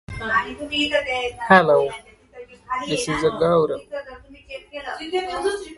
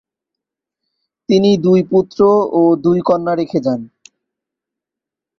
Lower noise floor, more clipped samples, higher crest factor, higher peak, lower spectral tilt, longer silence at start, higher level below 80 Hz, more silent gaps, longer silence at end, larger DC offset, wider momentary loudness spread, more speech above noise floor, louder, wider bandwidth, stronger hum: second, -43 dBFS vs -85 dBFS; neither; first, 22 dB vs 14 dB; about the same, 0 dBFS vs -2 dBFS; second, -4.5 dB/octave vs -8 dB/octave; second, 0.1 s vs 1.3 s; first, -48 dBFS vs -56 dBFS; neither; second, 0 s vs 1.5 s; neither; first, 19 LU vs 7 LU; second, 22 dB vs 72 dB; second, -21 LUFS vs -14 LUFS; first, 11.5 kHz vs 7.2 kHz; neither